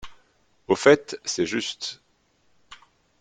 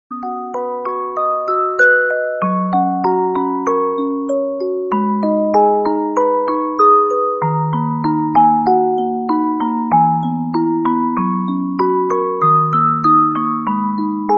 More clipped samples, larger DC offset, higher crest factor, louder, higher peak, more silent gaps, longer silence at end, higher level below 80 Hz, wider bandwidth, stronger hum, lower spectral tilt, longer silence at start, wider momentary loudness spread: neither; neither; first, 24 dB vs 14 dB; second, -23 LUFS vs -16 LUFS; about the same, -2 dBFS vs -2 dBFS; neither; first, 0.45 s vs 0 s; about the same, -62 dBFS vs -58 dBFS; first, 9.4 kHz vs 7.8 kHz; neither; second, -3.5 dB/octave vs -8.5 dB/octave; about the same, 0.05 s vs 0.1 s; first, 16 LU vs 7 LU